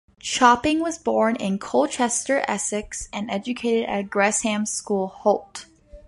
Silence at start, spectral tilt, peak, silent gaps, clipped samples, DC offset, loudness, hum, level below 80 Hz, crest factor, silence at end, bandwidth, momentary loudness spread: 0.25 s; -3.5 dB/octave; -2 dBFS; none; under 0.1%; under 0.1%; -22 LUFS; none; -52 dBFS; 20 dB; 0.05 s; 11.5 kHz; 10 LU